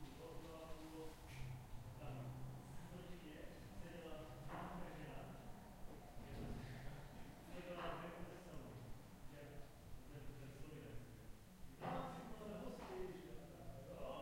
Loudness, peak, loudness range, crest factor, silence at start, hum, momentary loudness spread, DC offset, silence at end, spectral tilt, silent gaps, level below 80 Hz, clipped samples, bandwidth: -55 LUFS; -32 dBFS; 2 LU; 20 dB; 0 s; none; 9 LU; under 0.1%; 0 s; -6 dB/octave; none; -60 dBFS; under 0.1%; 16.5 kHz